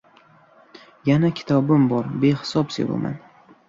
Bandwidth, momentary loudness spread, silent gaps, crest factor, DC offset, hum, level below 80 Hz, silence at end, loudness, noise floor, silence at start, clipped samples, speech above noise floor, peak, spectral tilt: 7.8 kHz; 9 LU; none; 16 dB; under 0.1%; none; -60 dBFS; 0.5 s; -21 LUFS; -53 dBFS; 0.75 s; under 0.1%; 34 dB; -6 dBFS; -7.5 dB/octave